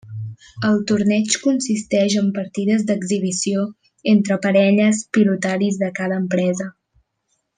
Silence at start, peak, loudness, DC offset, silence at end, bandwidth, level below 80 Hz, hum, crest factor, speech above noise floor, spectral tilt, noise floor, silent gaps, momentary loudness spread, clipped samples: 0.05 s; -4 dBFS; -19 LUFS; under 0.1%; 0.85 s; 9.8 kHz; -62 dBFS; none; 16 dB; 53 dB; -5 dB/octave; -71 dBFS; none; 9 LU; under 0.1%